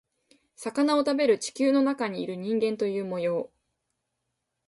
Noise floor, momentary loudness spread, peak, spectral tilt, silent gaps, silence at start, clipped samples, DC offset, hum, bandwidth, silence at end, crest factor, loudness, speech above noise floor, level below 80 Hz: -81 dBFS; 10 LU; -12 dBFS; -5 dB/octave; none; 0.6 s; under 0.1%; under 0.1%; none; 11.5 kHz; 1.2 s; 16 dB; -26 LUFS; 56 dB; -74 dBFS